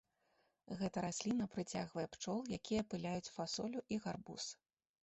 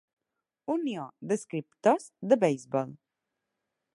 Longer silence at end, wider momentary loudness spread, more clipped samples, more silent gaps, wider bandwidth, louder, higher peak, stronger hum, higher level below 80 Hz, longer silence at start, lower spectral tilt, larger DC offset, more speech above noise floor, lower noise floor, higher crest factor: second, 0.5 s vs 1 s; second, 7 LU vs 13 LU; neither; neither; second, 8.2 kHz vs 11.5 kHz; second, -43 LUFS vs -29 LUFS; second, -24 dBFS vs -8 dBFS; neither; first, -70 dBFS vs -82 dBFS; about the same, 0.7 s vs 0.7 s; second, -4.5 dB/octave vs -6 dB/octave; neither; second, 37 dB vs 58 dB; second, -80 dBFS vs -87 dBFS; about the same, 20 dB vs 22 dB